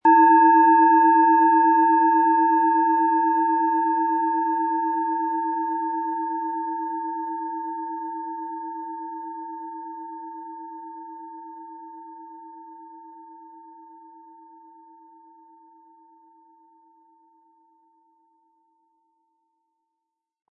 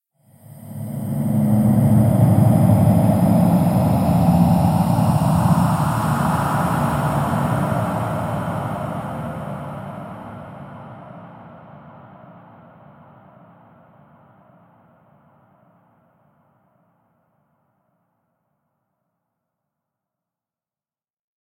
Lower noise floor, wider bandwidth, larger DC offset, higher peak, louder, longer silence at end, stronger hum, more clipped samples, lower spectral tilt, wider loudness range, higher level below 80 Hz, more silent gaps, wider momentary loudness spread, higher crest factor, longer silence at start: second, -83 dBFS vs under -90 dBFS; second, 2.8 kHz vs 16.5 kHz; neither; second, -6 dBFS vs -2 dBFS; about the same, -20 LUFS vs -18 LUFS; second, 7.15 s vs 9.1 s; neither; neither; about the same, -8 dB/octave vs -8 dB/octave; first, 24 LU vs 20 LU; second, -88 dBFS vs -42 dBFS; neither; first, 25 LU vs 21 LU; about the same, 18 dB vs 18 dB; second, 0.05 s vs 0.5 s